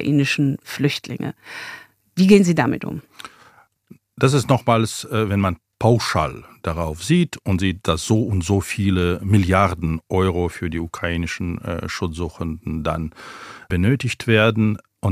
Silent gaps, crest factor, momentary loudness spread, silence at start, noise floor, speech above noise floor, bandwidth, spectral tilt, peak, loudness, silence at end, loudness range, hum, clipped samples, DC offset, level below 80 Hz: none; 20 dB; 14 LU; 0 s; -52 dBFS; 33 dB; 15.5 kHz; -6 dB/octave; 0 dBFS; -20 LUFS; 0 s; 5 LU; none; under 0.1%; under 0.1%; -44 dBFS